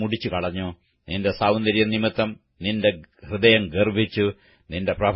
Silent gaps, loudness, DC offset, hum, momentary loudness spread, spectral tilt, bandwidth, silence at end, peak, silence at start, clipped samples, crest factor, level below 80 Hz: none; -22 LUFS; under 0.1%; none; 14 LU; -10.5 dB/octave; 5.8 kHz; 0 s; -2 dBFS; 0 s; under 0.1%; 20 dB; -48 dBFS